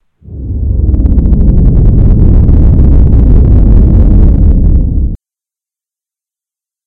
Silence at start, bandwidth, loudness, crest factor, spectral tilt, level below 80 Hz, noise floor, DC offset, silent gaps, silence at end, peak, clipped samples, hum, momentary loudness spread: 0.3 s; 2 kHz; -8 LUFS; 6 dB; -13 dB/octave; -8 dBFS; -87 dBFS; under 0.1%; none; 1.7 s; 0 dBFS; 7%; none; 9 LU